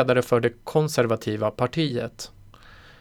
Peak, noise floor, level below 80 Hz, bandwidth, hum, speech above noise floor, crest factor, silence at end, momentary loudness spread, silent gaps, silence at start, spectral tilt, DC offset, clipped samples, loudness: -8 dBFS; -48 dBFS; -54 dBFS; 18.5 kHz; none; 25 dB; 18 dB; 0.75 s; 13 LU; none; 0 s; -6 dB/octave; under 0.1%; under 0.1%; -24 LUFS